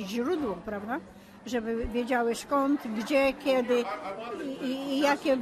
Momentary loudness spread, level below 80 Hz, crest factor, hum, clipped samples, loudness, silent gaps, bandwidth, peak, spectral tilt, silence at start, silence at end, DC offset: 10 LU; -52 dBFS; 16 dB; none; under 0.1%; -29 LUFS; none; 14 kHz; -14 dBFS; -4.5 dB/octave; 0 s; 0 s; under 0.1%